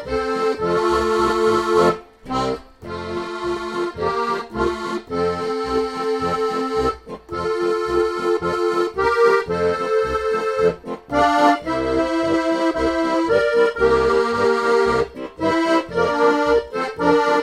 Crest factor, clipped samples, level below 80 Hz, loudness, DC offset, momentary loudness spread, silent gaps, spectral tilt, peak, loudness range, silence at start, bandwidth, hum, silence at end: 16 dB; under 0.1%; -42 dBFS; -19 LUFS; under 0.1%; 9 LU; none; -5.5 dB/octave; -2 dBFS; 5 LU; 0 s; 12.5 kHz; none; 0 s